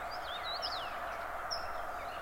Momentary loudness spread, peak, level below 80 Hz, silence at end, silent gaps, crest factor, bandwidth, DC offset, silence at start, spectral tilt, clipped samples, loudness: 4 LU; -24 dBFS; -56 dBFS; 0 s; none; 16 dB; 16 kHz; under 0.1%; 0 s; -2 dB/octave; under 0.1%; -39 LUFS